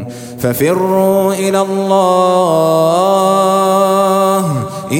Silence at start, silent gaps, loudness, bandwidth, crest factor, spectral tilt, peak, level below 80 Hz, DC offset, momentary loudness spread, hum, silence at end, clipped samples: 0 s; none; -12 LUFS; 17 kHz; 12 dB; -5.5 dB/octave; 0 dBFS; -52 dBFS; under 0.1%; 6 LU; none; 0 s; under 0.1%